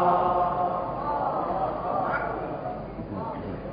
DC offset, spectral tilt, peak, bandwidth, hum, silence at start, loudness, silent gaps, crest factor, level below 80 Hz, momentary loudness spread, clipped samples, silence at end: under 0.1%; -11 dB/octave; -10 dBFS; 5.2 kHz; none; 0 s; -28 LUFS; none; 16 dB; -48 dBFS; 11 LU; under 0.1%; 0 s